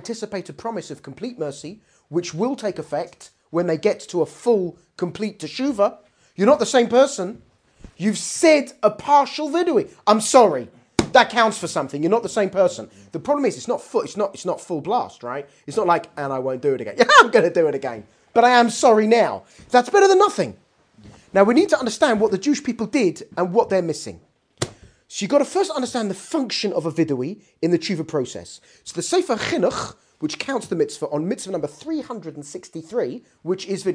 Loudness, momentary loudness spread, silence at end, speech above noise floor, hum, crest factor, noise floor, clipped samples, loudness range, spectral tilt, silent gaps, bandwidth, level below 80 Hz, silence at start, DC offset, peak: -20 LUFS; 16 LU; 0 s; 29 dB; none; 20 dB; -49 dBFS; under 0.1%; 8 LU; -4 dB/octave; none; 10.5 kHz; -58 dBFS; 0 s; under 0.1%; 0 dBFS